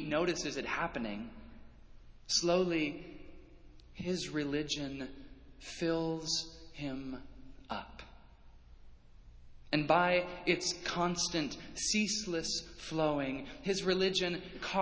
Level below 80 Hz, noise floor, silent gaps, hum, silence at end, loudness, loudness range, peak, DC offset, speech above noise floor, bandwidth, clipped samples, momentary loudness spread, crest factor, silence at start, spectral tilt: -58 dBFS; -56 dBFS; none; none; 0 s; -34 LUFS; 7 LU; -14 dBFS; under 0.1%; 22 dB; 8 kHz; under 0.1%; 17 LU; 22 dB; 0 s; -3.5 dB/octave